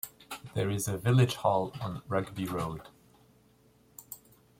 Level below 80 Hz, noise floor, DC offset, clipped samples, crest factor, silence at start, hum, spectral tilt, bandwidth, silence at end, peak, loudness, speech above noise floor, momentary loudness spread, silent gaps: -60 dBFS; -64 dBFS; under 0.1%; under 0.1%; 20 dB; 0.05 s; none; -6 dB/octave; 16.5 kHz; 0.45 s; -12 dBFS; -31 LUFS; 34 dB; 21 LU; none